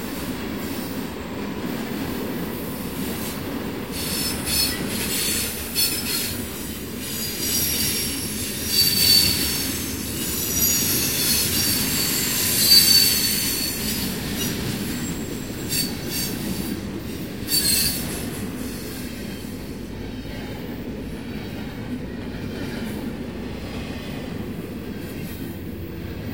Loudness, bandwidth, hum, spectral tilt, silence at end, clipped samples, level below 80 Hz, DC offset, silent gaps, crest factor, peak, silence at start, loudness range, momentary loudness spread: -22 LUFS; 16.5 kHz; none; -2.5 dB/octave; 0 s; under 0.1%; -42 dBFS; 0.4%; none; 22 dB; -2 dBFS; 0 s; 15 LU; 15 LU